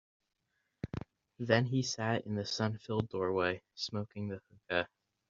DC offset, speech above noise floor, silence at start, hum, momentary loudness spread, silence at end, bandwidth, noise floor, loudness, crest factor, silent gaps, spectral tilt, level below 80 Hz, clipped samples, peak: under 0.1%; 47 dB; 0.85 s; none; 14 LU; 0.45 s; 7.4 kHz; -82 dBFS; -35 LUFS; 26 dB; none; -4.5 dB/octave; -66 dBFS; under 0.1%; -12 dBFS